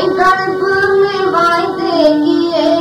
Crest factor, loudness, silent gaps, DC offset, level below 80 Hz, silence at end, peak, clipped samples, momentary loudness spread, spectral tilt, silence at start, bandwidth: 12 dB; -12 LUFS; none; under 0.1%; -48 dBFS; 0 s; 0 dBFS; under 0.1%; 3 LU; -5 dB/octave; 0 s; 13 kHz